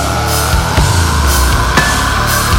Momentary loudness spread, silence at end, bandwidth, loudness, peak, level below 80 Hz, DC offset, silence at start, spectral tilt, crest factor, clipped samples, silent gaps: 2 LU; 0 s; 17 kHz; -11 LUFS; 0 dBFS; -16 dBFS; under 0.1%; 0 s; -3.5 dB/octave; 10 dB; under 0.1%; none